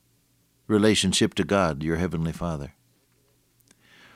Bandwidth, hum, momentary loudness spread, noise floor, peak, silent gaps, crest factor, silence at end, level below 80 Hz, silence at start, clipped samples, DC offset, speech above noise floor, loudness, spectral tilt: 15.5 kHz; none; 12 LU; -66 dBFS; -8 dBFS; none; 20 dB; 1.45 s; -48 dBFS; 0.7 s; under 0.1%; under 0.1%; 42 dB; -24 LUFS; -4.5 dB/octave